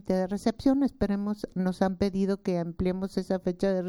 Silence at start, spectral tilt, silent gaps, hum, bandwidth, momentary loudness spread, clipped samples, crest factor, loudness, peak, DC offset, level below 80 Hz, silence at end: 0.05 s; -7.5 dB/octave; none; none; 12.5 kHz; 5 LU; under 0.1%; 16 dB; -28 LUFS; -10 dBFS; under 0.1%; -48 dBFS; 0 s